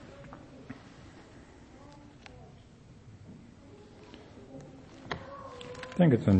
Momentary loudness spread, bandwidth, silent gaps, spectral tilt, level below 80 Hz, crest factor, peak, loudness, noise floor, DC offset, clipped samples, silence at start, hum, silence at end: 15 LU; 8.4 kHz; none; -8.5 dB/octave; -60 dBFS; 24 dB; -10 dBFS; -32 LUFS; -54 dBFS; under 0.1%; under 0.1%; 0.2 s; none; 0 s